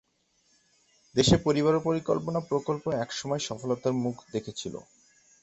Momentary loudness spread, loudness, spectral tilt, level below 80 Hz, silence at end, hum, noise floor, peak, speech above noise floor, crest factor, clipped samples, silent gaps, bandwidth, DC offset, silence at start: 13 LU; -28 LUFS; -5.5 dB/octave; -54 dBFS; 0.6 s; none; -70 dBFS; -8 dBFS; 42 dB; 22 dB; under 0.1%; none; 8.2 kHz; under 0.1%; 1.15 s